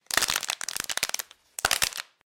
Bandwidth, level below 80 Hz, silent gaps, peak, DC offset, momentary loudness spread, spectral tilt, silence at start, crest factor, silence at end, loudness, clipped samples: 17 kHz; -58 dBFS; none; -6 dBFS; under 0.1%; 7 LU; 1 dB/octave; 0.1 s; 24 dB; 0.25 s; -27 LUFS; under 0.1%